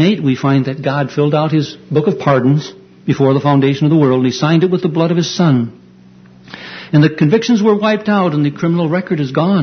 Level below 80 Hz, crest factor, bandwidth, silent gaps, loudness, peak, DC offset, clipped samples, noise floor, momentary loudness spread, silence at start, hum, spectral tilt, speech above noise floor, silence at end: -54 dBFS; 14 dB; 6.6 kHz; none; -14 LUFS; 0 dBFS; under 0.1%; under 0.1%; -41 dBFS; 6 LU; 0 s; none; -7 dB/octave; 29 dB; 0 s